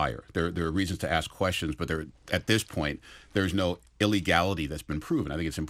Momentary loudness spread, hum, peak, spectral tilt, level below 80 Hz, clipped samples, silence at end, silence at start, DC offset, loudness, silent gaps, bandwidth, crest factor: 8 LU; none; -8 dBFS; -5 dB/octave; -46 dBFS; under 0.1%; 0 s; 0 s; under 0.1%; -29 LUFS; none; 16 kHz; 20 dB